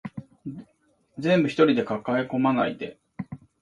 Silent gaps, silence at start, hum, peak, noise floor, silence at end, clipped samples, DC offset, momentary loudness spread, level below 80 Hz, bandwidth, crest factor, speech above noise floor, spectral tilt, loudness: none; 0.05 s; none; -6 dBFS; -66 dBFS; 0.25 s; under 0.1%; under 0.1%; 19 LU; -64 dBFS; 10.5 kHz; 20 dB; 43 dB; -7.5 dB/octave; -23 LUFS